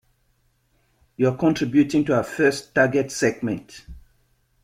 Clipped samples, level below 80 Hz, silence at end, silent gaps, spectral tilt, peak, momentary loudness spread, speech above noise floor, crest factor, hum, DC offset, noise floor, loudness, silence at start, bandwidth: under 0.1%; -52 dBFS; 0.65 s; none; -5.5 dB/octave; -4 dBFS; 10 LU; 45 dB; 18 dB; none; under 0.1%; -66 dBFS; -21 LUFS; 1.2 s; 15 kHz